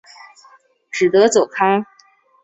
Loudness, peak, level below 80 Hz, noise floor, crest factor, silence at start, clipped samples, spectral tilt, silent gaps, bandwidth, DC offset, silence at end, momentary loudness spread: -16 LUFS; -2 dBFS; -64 dBFS; -54 dBFS; 16 dB; 0.95 s; under 0.1%; -4 dB/octave; none; 8.2 kHz; under 0.1%; 0.6 s; 14 LU